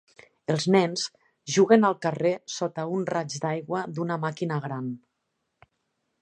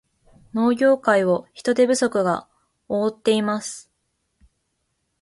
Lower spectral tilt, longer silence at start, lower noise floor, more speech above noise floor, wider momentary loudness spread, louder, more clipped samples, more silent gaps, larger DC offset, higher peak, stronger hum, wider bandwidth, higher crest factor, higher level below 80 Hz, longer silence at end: about the same, -5.5 dB/octave vs -4.5 dB/octave; about the same, 0.5 s vs 0.55 s; first, -79 dBFS vs -73 dBFS; about the same, 53 dB vs 53 dB; first, 14 LU vs 10 LU; second, -26 LUFS vs -21 LUFS; neither; neither; neither; about the same, -4 dBFS vs -4 dBFS; neither; second, 10 kHz vs 11.5 kHz; about the same, 22 dB vs 18 dB; second, -74 dBFS vs -64 dBFS; second, 1.25 s vs 1.4 s